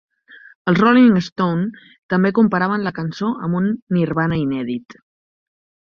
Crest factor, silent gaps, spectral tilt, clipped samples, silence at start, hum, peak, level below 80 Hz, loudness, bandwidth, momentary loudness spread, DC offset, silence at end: 16 dB; 1.32-1.36 s, 1.98-2.09 s, 3.82-3.87 s; -8 dB/octave; under 0.1%; 0.65 s; none; -2 dBFS; -54 dBFS; -18 LUFS; 6.8 kHz; 12 LU; under 0.1%; 1.15 s